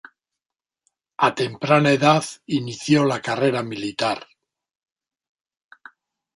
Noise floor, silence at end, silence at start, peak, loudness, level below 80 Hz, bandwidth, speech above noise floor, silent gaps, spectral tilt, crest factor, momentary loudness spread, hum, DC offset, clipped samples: -89 dBFS; 2.15 s; 1.2 s; -2 dBFS; -21 LUFS; -64 dBFS; 11.5 kHz; 69 dB; none; -5.5 dB/octave; 20 dB; 10 LU; none; under 0.1%; under 0.1%